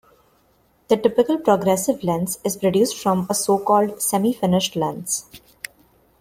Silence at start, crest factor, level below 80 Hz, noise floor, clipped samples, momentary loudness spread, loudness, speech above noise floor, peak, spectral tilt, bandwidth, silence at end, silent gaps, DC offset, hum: 0.9 s; 18 dB; -58 dBFS; -60 dBFS; under 0.1%; 8 LU; -20 LUFS; 41 dB; -2 dBFS; -4.5 dB/octave; 16.5 kHz; 0.85 s; none; under 0.1%; none